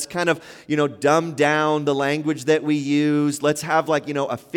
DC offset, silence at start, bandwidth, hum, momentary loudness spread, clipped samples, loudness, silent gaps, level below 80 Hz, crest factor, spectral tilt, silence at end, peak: under 0.1%; 0 s; 16.5 kHz; none; 4 LU; under 0.1%; -21 LUFS; none; -66 dBFS; 16 dB; -5 dB/octave; 0 s; -6 dBFS